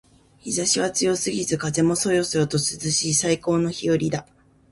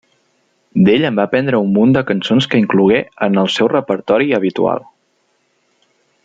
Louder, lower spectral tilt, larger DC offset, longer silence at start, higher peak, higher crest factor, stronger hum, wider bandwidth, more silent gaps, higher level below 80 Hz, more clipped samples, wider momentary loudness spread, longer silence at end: second, -22 LUFS vs -14 LUFS; second, -4 dB/octave vs -7 dB/octave; neither; second, 0.45 s vs 0.75 s; second, -6 dBFS vs -2 dBFS; about the same, 18 dB vs 14 dB; neither; first, 11.5 kHz vs 7.8 kHz; neither; about the same, -54 dBFS vs -56 dBFS; neither; about the same, 5 LU vs 5 LU; second, 0.5 s vs 1.45 s